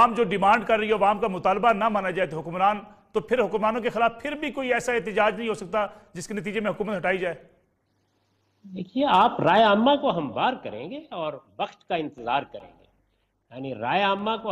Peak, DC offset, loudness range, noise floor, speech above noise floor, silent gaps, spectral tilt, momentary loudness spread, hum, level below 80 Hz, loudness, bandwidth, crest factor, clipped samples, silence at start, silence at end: -8 dBFS; under 0.1%; 7 LU; -70 dBFS; 46 dB; none; -5.5 dB/octave; 14 LU; none; -58 dBFS; -24 LUFS; 13.5 kHz; 18 dB; under 0.1%; 0 s; 0 s